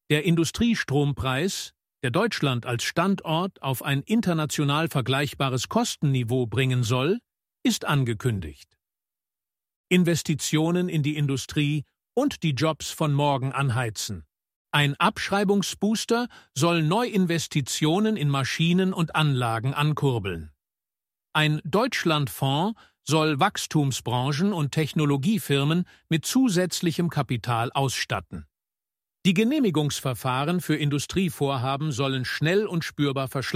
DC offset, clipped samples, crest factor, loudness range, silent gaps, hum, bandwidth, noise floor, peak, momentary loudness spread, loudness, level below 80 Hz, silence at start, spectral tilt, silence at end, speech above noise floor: under 0.1%; under 0.1%; 18 dB; 2 LU; 9.76-9.84 s, 14.56-14.65 s; none; 16 kHz; under -90 dBFS; -6 dBFS; 5 LU; -25 LUFS; -54 dBFS; 0.1 s; -5 dB/octave; 0 s; over 66 dB